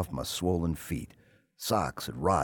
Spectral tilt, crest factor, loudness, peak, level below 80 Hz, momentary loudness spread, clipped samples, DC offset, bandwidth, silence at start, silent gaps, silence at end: -5 dB/octave; 18 dB; -32 LUFS; -12 dBFS; -48 dBFS; 9 LU; under 0.1%; under 0.1%; 18 kHz; 0 s; none; 0 s